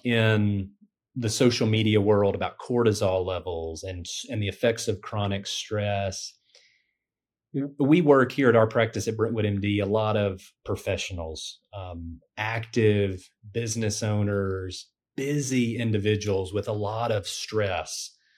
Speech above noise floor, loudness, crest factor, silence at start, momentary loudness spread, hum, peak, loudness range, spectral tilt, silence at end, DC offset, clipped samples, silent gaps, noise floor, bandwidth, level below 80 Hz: 64 dB; -26 LUFS; 20 dB; 0.05 s; 14 LU; none; -6 dBFS; 6 LU; -5.5 dB/octave; 0.3 s; under 0.1%; under 0.1%; none; -90 dBFS; 14 kHz; -58 dBFS